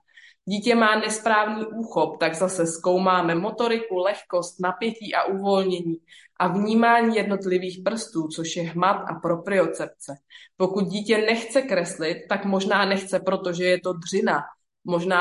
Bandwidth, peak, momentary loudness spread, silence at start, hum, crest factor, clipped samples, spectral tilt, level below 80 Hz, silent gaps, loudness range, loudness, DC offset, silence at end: 11.5 kHz; -6 dBFS; 9 LU; 0.45 s; none; 18 dB; under 0.1%; -4.5 dB/octave; -72 dBFS; none; 3 LU; -23 LUFS; under 0.1%; 0 s